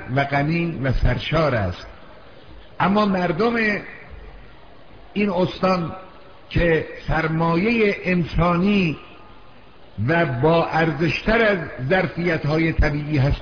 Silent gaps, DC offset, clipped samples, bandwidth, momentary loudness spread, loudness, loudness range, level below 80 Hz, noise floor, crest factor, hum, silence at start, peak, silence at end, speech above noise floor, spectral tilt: none; 0.5%; under 0.1%; 5.4 kHz; 9 LU; -20 LUFS; 4 LU; -32 dBFS; -47 dBFS; 14 dB; none; 0 s; -6 dBFS; 0 s; 28 dB; -8 dB/octave